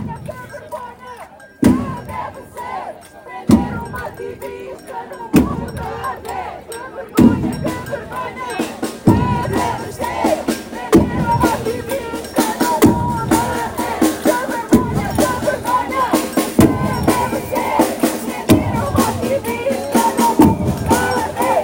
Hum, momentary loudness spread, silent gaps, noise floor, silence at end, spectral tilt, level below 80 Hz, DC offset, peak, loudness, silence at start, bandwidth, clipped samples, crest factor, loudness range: none; 16 LU; none; -37 dBFS; 0 s; -5.5 dB/octave; -38 dBFS; under 0.1%; 0 dBFS; -17 LUFS; 0 s; 17 kHz; under 0.1%; 16 dB; 6 LU